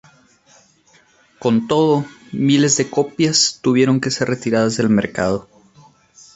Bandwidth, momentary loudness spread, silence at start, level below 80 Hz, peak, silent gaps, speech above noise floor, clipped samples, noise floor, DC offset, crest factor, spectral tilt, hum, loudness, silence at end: 8.2 kHz; 7 LU; 1.4 s; -54 dBFS; -2 dBFS; none; 38 dB; under 0.1%; -54 dBFS; under 0.1%; 16 dB; -4.5 dB/octave; none; -17 LUFS; 0.95 s